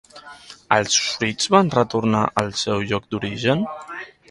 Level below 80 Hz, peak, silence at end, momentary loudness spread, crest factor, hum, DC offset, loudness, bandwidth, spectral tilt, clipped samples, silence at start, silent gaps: -52 dBFS; 0 dBFS; 0.25 s; 17 LU; 22 dB; none; under 0.1%; -20 LUFS; 11.5 kHz; -4 dB/octave; under 0.1%; 0.15 s; none